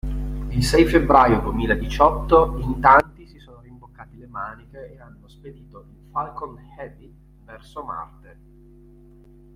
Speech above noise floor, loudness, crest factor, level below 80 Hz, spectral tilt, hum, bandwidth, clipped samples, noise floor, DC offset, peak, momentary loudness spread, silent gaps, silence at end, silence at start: 28 dB; -18 LUFS; 20 dB; -34 dBFS; -6 dB/octave; none; 16 kHz; under 0.1%; -48 dBFS; under 0.1%; -2 dBFS; 25 LU; none; 1.5 s; 0.05 s